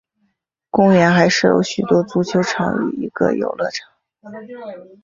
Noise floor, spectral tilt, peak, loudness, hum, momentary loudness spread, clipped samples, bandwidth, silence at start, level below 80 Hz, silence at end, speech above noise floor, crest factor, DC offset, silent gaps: -69 dBFS; -5.5 dB/octave; -2 dBFS; -16 LUFS; none; 21 LU; under 0.1%; 7.6 kHz; 0.75 s; -54 dBFS; 0.2 s; 52 dB; 16 dB; under 0.1%; none